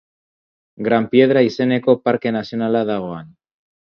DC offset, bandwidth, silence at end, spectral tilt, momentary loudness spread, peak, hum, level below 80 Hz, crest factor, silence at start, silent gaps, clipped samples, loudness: under 0.1%; 6.6 kHz; 0.7 s; -7.5 dB/octave; 11 LU; 0 dBFS; none; -60 dBFS; 18 dB; 0.8 s; none; under 0.1%; -17 LUFS